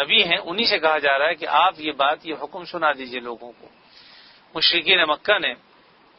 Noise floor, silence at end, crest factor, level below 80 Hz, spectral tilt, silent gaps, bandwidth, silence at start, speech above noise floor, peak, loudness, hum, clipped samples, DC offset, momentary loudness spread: -54 dBFS; 0.65 s; 20 dB; -64 dBFS; -5 dB/octave; none; 6 kHz; 0 s; 33 dB; -2 dBFS; -19 LUFS; none; under 0.1%; under 0.1%; 16 LU